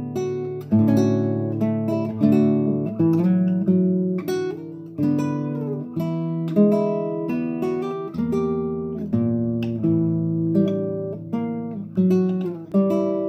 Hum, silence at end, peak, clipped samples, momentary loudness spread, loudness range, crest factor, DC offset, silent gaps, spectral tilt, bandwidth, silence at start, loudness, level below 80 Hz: none; 0 s; -6 dBFS; under 0.1%; 9 LU; 3 LU; 14 dB; under 0.1%; none; -9.5 dB/octave; 15 kHz; 0 s; -22 LUFS; -58 dBFS